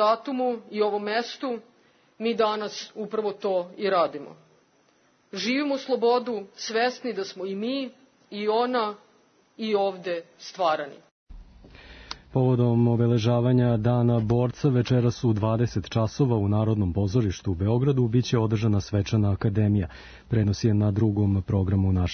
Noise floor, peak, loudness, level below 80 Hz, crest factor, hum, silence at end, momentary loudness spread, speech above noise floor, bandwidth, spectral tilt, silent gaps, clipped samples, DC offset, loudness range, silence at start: -63 dBFS; -10 dBFS; -25 LUFS; -52 dBFS; 16 dB; none; 0 s; 11 LU; 39 dB; 6.6 kHz; -7.5 dB/octave; 11.11-11.26 s; under 0.1%; under 0.1%; 6 LU; 0 s